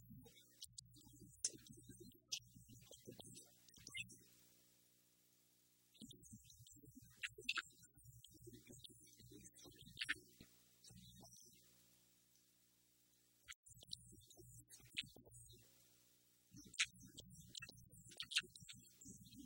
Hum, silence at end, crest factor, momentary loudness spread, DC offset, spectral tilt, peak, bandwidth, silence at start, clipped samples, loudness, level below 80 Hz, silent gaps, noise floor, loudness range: 60 Hz at -75 dBFS; 0 s; 34 dB; 21 LU; under 0.1%; -1 dB/octave; -22 dBFS; 16.5 kHz; 0 s; under 0.1%; -51 LUFS; -78 dBFS; 13.55-13.63 s; -77 dBFS; 13 LU